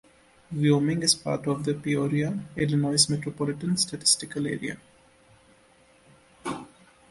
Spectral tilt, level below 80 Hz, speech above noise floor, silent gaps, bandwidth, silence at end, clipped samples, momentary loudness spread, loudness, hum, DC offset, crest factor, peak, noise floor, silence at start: -4 dB/octave; -60 dBFS; 33 dB; none; 11.5 kHz; 0.45 s; under 0.1%; 14 LU; -25 LUFS; none; under 0.1%; 22 dB; -6 dBFS; -59 dBFS; 0.5 s